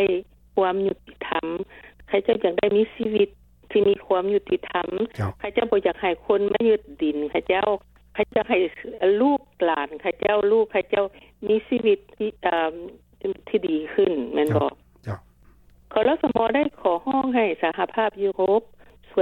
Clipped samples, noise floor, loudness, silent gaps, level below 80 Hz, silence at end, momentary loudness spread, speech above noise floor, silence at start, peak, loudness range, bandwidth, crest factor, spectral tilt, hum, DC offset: under 0.1%; -53 dBFS; -23 LUFS; none; -56 dBFS; 0 s; 9 LU; 31 dB; 0 s; -6 dBFS; 2 LU; 4.3 kHz; 18 dB; -7.5 dB/octave; none; under 0.1%